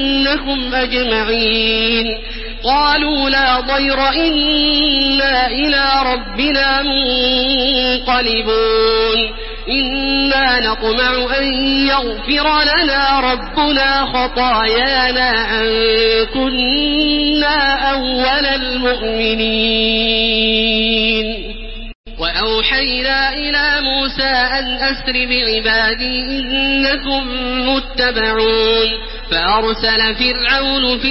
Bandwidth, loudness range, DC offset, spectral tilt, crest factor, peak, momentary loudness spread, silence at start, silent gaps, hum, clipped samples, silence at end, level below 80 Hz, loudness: 5.8 kHz; 2 LU; under 0.1%; -7.5 dB/octave; 14 dB; -2 dBFS; 5 LU; 0 s; 21.95-22.04 s; none; under 0.1%; 0 s; -30 dBFS; -14 LUFS